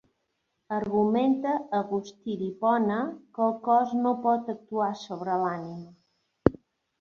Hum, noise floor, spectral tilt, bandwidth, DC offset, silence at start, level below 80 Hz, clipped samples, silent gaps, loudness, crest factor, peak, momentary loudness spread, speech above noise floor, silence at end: none; -78 dBFS; -7.5 dB/octave; 7 kHz; under 0.1%; 0.7 s; -58 dBFS; under 0.1%; none; -27 LUFS; 26 dB; -2 dBFS; 10 LU; 51 dB; 0.45 s